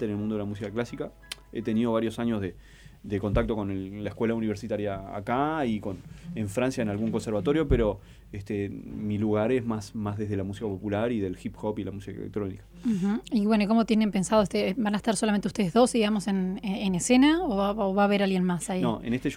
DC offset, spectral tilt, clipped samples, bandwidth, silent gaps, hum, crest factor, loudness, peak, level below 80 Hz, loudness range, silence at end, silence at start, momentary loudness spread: under 0.1%; -6 dB/octave; under 0.1%; 15.5 kHz; none; none; 18 dB; -27 LUFS; -10 dBFS; -46 dBFS; 6 LU; 0 s; 0 s; 12 LU